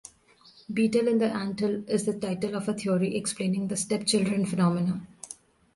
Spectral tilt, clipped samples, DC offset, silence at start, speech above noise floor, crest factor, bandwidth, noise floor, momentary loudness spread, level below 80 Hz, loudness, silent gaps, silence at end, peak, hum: -5.5 dB/octave; under 0.1%; under 0.1%; 0.7 s; 31 dB; 16 dB; 11.5 kHz; -58 dBFS; 10 LU; -64 dBFS; -27 LUFS; none; 0.45 s; -12 dBFS; none